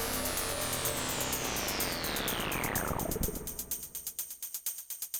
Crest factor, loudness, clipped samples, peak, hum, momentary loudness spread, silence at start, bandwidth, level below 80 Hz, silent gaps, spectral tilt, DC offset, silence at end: 18 dB; -33 LUFS; under 0.1%; -18 dBFS; none; 6 LU; 0 s; over 20 kHz; -46 dBFS; none; -2.5 dB/octave; under 0.1%; 0 s